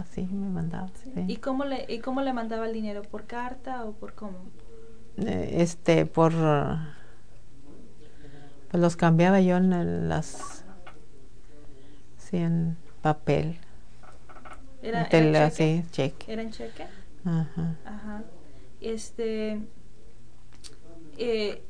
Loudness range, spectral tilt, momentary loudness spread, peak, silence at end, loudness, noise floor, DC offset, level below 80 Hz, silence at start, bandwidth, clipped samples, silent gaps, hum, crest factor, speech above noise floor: 9 LU; -7 dB/octave; 21 LU; -6 dBFS; 0 s; -27 LUFS; -52 dBFS; 2%; -50 dBFS; 0 s; 10 kHz; under 0.1%; none; none; 24 dB; 25 dB